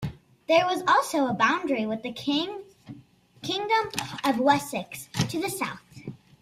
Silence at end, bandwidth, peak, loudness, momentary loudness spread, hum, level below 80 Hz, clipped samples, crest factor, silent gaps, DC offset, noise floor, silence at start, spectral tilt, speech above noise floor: 0.25 s; 16 kHz; -6 dBFS; -26 LUFS; 19 LU; none; -60 dBFS; under 0.1%; 20 dB; none; under 0.1%; -53 dBFS; 0 s; -4 dB/octave; 28 dB